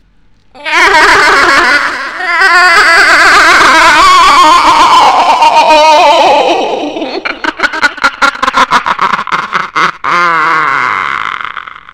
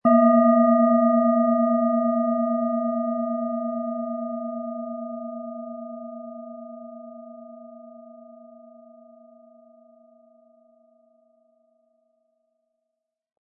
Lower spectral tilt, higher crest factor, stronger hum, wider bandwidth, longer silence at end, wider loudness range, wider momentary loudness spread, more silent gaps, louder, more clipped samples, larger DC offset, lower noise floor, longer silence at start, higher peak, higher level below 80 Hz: second, -1.5 dB/octave vs -13 dB/octave; second, 6 dB vs 18 dB; neither; first, 18.5 kHz vs 2.9 kHz; second, 0.35 s vs 5 s; second, 7 LU vs 24 LU; second, 12 LU vs 25 LU; neither; first, -5 LUFS vs -22 LUFS; first, 4% vs under 0.1%; first, 0.4% vs under 0.1%; second, -47 dBFS vs -82 dBFS; first, 0.55 s vs 0.05 s; first, 0 dBFS vs -6 dBFS; first, -36 dBFS vs -84 dBFS